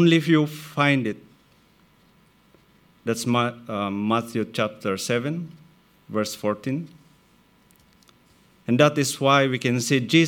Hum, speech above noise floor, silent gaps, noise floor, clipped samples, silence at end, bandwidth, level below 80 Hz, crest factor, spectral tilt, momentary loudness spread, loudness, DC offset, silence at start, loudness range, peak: none; 36 dB; none; -58 dBFS; under 0.1%; 0 s; 18.5 kHz; -68 dBFS; 22 dB; -5 dB/octave; 13 LU; -23 LUFS; under 0.1%; 0 s; 7 LU; -2 dBFS